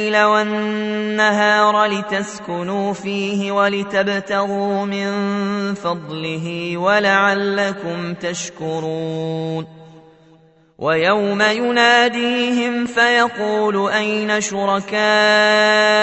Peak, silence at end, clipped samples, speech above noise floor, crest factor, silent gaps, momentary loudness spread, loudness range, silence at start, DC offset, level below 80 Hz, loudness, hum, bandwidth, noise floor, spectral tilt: 0 dBFS; 0 s; under 0.1%; 34 dB; 18 dB; none; 12 LU; 5 LU; 0 s; under 0.1%; -62 dBFS; -17 LUFS; none; 8.4 kHz; -51 dBFS; -4 dB/octave